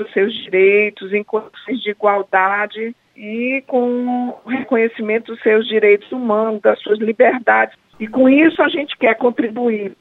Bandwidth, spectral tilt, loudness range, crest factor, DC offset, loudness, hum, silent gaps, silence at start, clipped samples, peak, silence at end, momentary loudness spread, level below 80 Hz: 4.1 kHz; -7.5 dB/octave; 4 LU; 16 dB; under 0.1%; -16 LUFS; none; none; 0 s; under 0.1%; 0 dBFS; 0.05 s; 11 LU; -66 dBFS